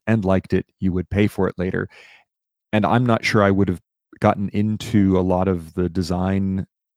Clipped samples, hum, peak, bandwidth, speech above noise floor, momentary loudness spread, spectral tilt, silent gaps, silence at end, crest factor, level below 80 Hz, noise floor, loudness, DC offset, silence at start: under 0.1%; none; 0 dBFS; 13.5 kHz; 55 dB; 7 LU; -7.5 dB/octave; none; 0.3 s; 20 dB; -46 dBFS; -75 dBFS; -21 LUFS; under 0.1%; 0.05 s